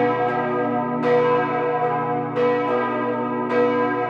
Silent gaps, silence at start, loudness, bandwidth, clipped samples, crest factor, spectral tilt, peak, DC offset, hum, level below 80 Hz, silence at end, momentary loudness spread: none; 0 s; -21 LUFS; 6.4 kHz; under 0.1%; 12 dB; -8 dB/octave; -8 dBFS; under 0.1%; none; -64 dBFS; 0 s; 4 LU